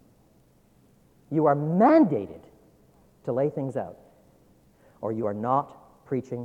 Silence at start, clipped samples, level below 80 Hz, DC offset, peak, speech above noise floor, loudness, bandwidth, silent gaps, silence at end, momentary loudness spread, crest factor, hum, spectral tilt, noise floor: 1.3 s; under 0.1%; -68 dBFS; under 0.1%; -8 dBFS; 36 dB; -25 LUFS; 7.6 kHz; none; 0 s; 19 LU; 20 dB; none; -10 dB/octave; -60 dBFS